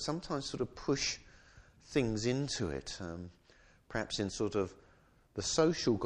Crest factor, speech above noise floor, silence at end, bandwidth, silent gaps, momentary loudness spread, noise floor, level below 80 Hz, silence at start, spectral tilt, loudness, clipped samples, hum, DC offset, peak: 20 dB; 30 dB; 0 s; 11 kHz; none; 13 LU; -65 dBFS; -56 dBFS; 0 s; -4.5 dB/octave; -36 LUFS; under 0.1%; none; under 0.1%; -16 dBFS